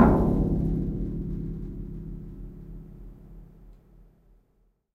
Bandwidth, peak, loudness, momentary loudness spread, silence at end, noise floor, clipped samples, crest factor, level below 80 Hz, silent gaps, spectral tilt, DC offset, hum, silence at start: 4 kHz; -4 dBFS; -28 LUFS; 24 LU; 1.2 s; -67 dBFS; under 0.1%; 24 dB; -36 dBFS; none; -11 dB/octave; under 0.1%; none; 0 s